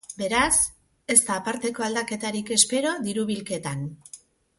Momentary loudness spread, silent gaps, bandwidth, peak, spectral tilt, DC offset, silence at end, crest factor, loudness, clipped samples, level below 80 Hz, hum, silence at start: 13 LU; none; 12 kHz; -2 dBFS; -2 dB/octave; under 0.1%; 0.4 s; 24 dB; -23 LUFS; under 0.1%; -54 dBFS; none; 0.1 s